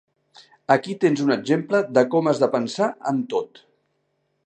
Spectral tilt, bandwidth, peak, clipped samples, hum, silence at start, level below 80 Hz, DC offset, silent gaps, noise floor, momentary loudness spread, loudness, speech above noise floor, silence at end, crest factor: -6 dB/octave; 9.4 kHz; -2 dBFS; under 0.1%; none; 0.7 s; -74 dBFS; under 0.1%; none; -71 dBFS; 8 LU; -21 LUFS; 51 dB; 1 s; 20 dB